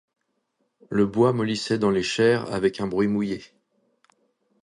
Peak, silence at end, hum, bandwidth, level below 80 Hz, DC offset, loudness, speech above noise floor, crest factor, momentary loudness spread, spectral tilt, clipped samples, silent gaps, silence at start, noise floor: -6 dBFS; 1.2 s; none; 11 kHz; -58 dBFS; under 0.1%; -23 LUFS; 51 dB; 18 dB; 7 LU; -6 dB/octave; under 0.1%; none; 0.9 s; -74 dBFS